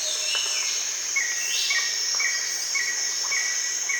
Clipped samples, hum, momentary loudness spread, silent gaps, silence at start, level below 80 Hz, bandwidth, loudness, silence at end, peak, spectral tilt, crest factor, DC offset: under 0.1%; none; 2 LU; none; 0 s; -72 dBFS; 19.5 kHz; -23 LUFS; 0 s; -12 dBFS; 4.5 dB/octave; 14 dB; under 0.1%